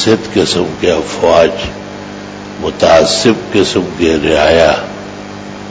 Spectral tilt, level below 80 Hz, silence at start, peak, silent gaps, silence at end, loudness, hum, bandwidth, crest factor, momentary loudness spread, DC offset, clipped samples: -4.5 dB/octave; -34 dBFS; 0 s; 0 dBFS; none; 0 s; -11 LUFS; 50 Hz at -30 dBFS; 8 kHz; 12 dB; 18 LU; under 0.1%; 0.5%